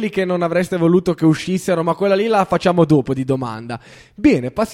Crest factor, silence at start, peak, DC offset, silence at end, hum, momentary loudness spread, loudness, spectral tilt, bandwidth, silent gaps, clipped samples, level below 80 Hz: 16 dB; 0 s; 0 dBFS; under 0.1%; 0 s; none; 7 LU; -17 LUFS; -7 dB/octave; 14 kHz; none; under 0.1%; -48 dBFS